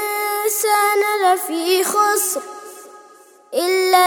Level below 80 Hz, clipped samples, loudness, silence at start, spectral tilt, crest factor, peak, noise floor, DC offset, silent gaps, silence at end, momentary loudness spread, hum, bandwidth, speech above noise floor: -76 dBFS; under 0.1%; -17 LUFS; 0 s; 0 dB/octave; 18 dB; 0 dBFS; -47 dBFS; under 0.1%; none; 0 s; 11 LU; none; over 20 kHz; 30 dB